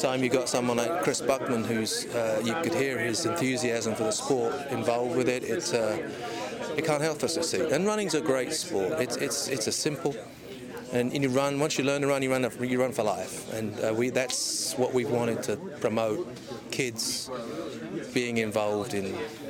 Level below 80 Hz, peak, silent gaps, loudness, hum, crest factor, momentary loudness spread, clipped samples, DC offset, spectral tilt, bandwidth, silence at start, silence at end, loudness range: -64 dBFS; -14 dBFS; none; -28 LUFS; none; 14 dB; 8 LU; under 0.1%; under 0.1%; -4 dB/octave; 17.5 kHz; 0 s; 0 s; 2 LU